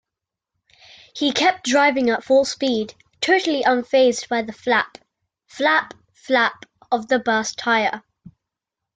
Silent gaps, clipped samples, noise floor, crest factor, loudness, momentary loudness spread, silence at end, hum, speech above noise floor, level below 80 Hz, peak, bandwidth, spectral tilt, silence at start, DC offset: none; under 0.1%; -85 dBFS; 16 dB; -19 LUFS; 8 LU; 0.65 s; none; 66 dB; -66 dBFS; -4 dBFS; 9.4 kHz; -2.5 dB/octave; 1.15 s; under 0.1%